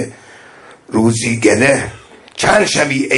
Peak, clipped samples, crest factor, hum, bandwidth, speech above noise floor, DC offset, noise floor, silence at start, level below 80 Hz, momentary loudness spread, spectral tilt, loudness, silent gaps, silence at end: 0 dBFS; under 0.1%; 16 dB; none; 11.5 kHz; 28 dB; under 0.1%; -40 dBFS; 0 s; -44 dBFS; 15 LU; -4 dB/octave; -13 LUFS; none; 0 s